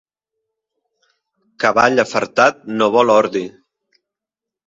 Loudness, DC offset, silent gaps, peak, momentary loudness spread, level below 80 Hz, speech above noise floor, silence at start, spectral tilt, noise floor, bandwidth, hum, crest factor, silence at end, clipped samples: -15 LUFS; under 0.1%; none; 0 dBFS; 8 LU; -60 dBFS; 71 dB; 1.6 s; -4 dB/octave; -86 dBFS; 7.8 kHz; none; 18 dB; 1.2 s; under 0.1%